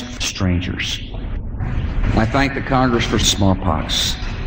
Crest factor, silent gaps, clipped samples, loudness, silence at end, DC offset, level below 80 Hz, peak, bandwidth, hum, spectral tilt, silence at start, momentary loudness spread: 16 dB; none; under 0.1%; -19 LUFS; 0 s; under 0.1%; -26 dBFS; -2 dBFS; 16.5 kHz; none; -4.5 dB/octave; 0 s; 10 LU